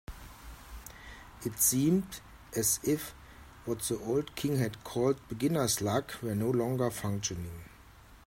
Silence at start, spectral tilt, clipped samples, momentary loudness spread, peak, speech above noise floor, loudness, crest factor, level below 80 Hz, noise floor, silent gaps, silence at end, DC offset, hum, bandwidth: 0.1 s; -4.5 dB/octave; under 0.1%; 21 LU; -14 dBFS; 24 dB; -31 LUFS; 20 dB; -54 dBFS; -55 dBFS; none; 0.1 s; under 0.1%; none; 16.5 kHz